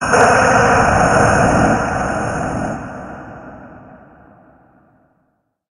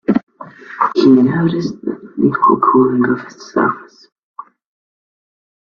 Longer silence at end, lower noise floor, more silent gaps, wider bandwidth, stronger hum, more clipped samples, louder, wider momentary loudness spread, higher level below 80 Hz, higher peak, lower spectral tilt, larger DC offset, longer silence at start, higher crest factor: about the same, 1.95 s vs 1.9 s; first, -65 dBFS vs -35 dBFS; second, none vs 0.23-0.27 s; first, 11.5 kHz vs 6.8 kHz; neither; neither; about the same, -14 LUFS vs -14 LUFS; first, 22 LU vs 13 LU; first, -34 dBFS vs -56 dBFS; about the same, 0 dBFS vs 0 dBFS; second, -5 dB/octave vs -8 dB/octave; neither; about the same, 0 s vs 0.1 s; about the same, 16 dB vs 16 dB